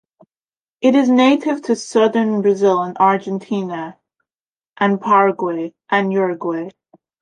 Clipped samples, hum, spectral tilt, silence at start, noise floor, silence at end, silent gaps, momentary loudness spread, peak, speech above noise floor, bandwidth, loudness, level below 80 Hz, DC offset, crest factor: under 0.1%; none; -6 dB/octave; 0.8 s; under -90 dBFS; 0.5 s; 4.35-4.54 s, 4.68-4.74 s; 12 LU; -2 dBFS; over 74 dB; 10 kHz; -17 LUFS; -68 dBFS; under 0.1%; 16 dB